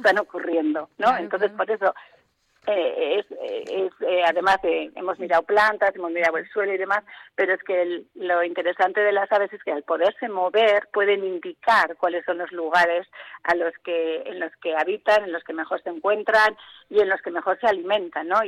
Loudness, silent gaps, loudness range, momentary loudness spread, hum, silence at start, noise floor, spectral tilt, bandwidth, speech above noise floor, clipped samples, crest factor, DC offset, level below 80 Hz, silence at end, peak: -23 LUFS; none; 3 LU; 10 LU; none; 0 s; -62 dBFS; -4 dB/octave; 13 kHz; 40 dB; under 0.1%; 14 dB; under 0.1%; -66 dBFS; 0 s; -8 dBFS